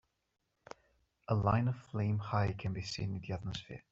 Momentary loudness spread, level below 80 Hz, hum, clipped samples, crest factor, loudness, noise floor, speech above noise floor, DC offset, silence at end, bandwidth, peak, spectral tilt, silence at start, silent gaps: 23 LU; -60 dBFS; none; under 0.1%; 20 dB; -36 LUFS; -83 dBFS; 48 dB; under 0.1%; 0.1 s; 7.8 kHz; -16 dBFS; -7 dB/octave; 1.3 s; none